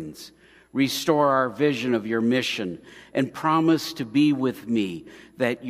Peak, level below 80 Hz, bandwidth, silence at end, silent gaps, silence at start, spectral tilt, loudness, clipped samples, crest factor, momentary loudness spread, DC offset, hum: -6 dBFS; -64 dBFS; 15.5 kHz; 0 s; none; 0 s; -5.5 dB/octave; -24 LUFS; under 0.1%; 18 dB; 12 LU; under 0.1%; none